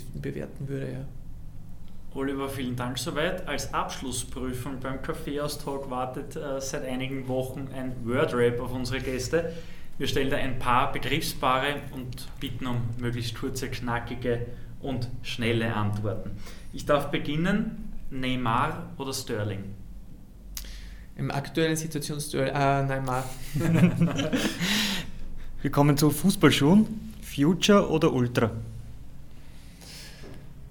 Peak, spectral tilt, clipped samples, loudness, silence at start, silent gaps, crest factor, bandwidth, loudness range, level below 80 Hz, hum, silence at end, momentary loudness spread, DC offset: -6 dBFS; -5.5 dB/octave; under 0.1%; -28 LUFS; 0 s; none; 22 dB; 19.5 kHz; 9 LU; -40 dBFS; none; 0 s; 20 LU; under 0.1%